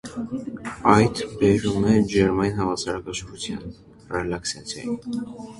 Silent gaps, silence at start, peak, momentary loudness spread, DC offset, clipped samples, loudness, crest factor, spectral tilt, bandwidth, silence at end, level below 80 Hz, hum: none; 0.05 s; -2 dBFS; 13 LU; under 0.1%; under 0.1%; -23 LUFS; 20 dB; -5.5 dB/octave; 11.5 kHz; 0 s; -46 dBFS; none